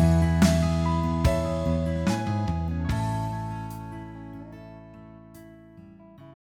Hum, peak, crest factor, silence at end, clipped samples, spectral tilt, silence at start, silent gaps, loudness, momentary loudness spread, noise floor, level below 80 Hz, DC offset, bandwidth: none; -8 dBFS; 18 dB; 0.1 s; under 0.1%; -7 dB/octave; 0 s; none; -26 LUFS; 25 LU; -48 dBFS; -36 dBFS; under 0.1%; 16 kHz